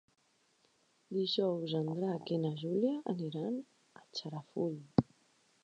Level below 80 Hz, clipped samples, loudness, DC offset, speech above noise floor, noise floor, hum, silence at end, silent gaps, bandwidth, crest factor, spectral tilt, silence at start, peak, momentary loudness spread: -68 dBFS; under 0.1%; -36 LUFS; under 0.1%; 38 dB; -73 dBFS; none; 0.6 s; none; 9.4 kHz; 26 dB; -7.5 dB/octave; 1.1 s; -12 dBFS; 10 LU